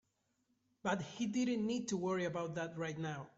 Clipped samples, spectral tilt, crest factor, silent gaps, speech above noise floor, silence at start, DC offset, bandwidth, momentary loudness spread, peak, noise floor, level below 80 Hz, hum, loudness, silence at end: under 0.1%; -5.5 dB/octave; 18 dB; none; 42 dB; 0.85 s; under 0.1%; 8 kHz; 6 LU; -22 dBFS; -81 dBFS; -76 dBFS; none; -39 LUFS; 0.1 s